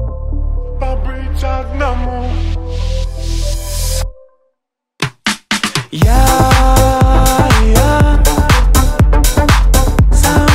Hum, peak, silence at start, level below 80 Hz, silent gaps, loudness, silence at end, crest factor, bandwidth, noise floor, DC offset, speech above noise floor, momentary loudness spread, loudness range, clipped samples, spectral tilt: none; 0 dBFS; 0 s; -14 dBFS; none; -13 LUFS; 0 s; 10 dB; 16.5 kHz; -71 dBFS; under 0.1%; 61 dB; 11 LU; 9 LU; under 0.1%; -5 dB/octave